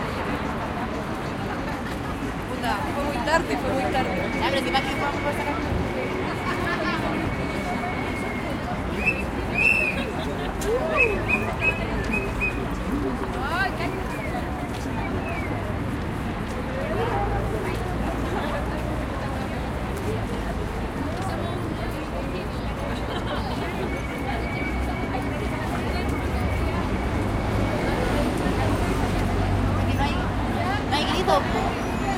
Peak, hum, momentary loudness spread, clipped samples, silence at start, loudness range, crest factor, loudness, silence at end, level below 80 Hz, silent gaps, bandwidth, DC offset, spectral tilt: -6 dBFS; none; 6 LU; under 0.1%; 0 s; 5 LU; 20 dB; -26 LUFS; 0 s; -34 dBFS; none; 16.5 kHz; under 0.1%; -6 dB/octave